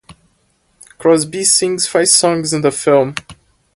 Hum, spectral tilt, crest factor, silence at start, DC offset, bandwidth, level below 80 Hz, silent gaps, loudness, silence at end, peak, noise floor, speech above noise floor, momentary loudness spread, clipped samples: none; -3 dB/octave; 16 dB; 0.1 s; under 0.1%; 16 kHz; -54 dBFS; none; -13 LUFS; 0.45 s; 0 dBFS; -60 dBFS; 46 dB; 7 LU; under 0.1%